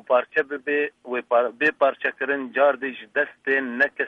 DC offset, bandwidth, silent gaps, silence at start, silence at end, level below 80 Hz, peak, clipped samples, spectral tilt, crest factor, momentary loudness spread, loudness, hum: under 0.1%; 6.4 kHz; none; 0.1 s; 0 s; -74 dBFS; -6 dBFS; under 0.1%; -5.5 dB/octave; 16 dB; 6 LU; -23 LUFS; none